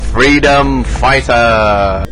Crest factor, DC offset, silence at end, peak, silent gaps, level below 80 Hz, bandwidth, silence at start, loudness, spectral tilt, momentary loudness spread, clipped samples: 8 dB; under 0.1%; 0 s; 0 dBFS; none; -20 dBFS; 10.5 kHz; 0 s; -10 LUFS; -5 dB/octave; 5 LU; under 0.1%